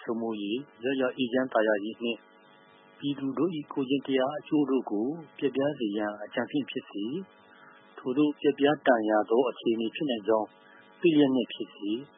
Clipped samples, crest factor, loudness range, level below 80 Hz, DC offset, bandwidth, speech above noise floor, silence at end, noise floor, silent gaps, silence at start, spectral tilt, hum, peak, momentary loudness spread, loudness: under 0.1%; 22 dB; 5 LU; -82 dBFS; under 0.1%; 3.8 kHz; 29 dB; 0.1 s; -57 dBFS; none; 0 s; -10 dB/octave; none; -8 dBFS; 10 LU; -29 LUFS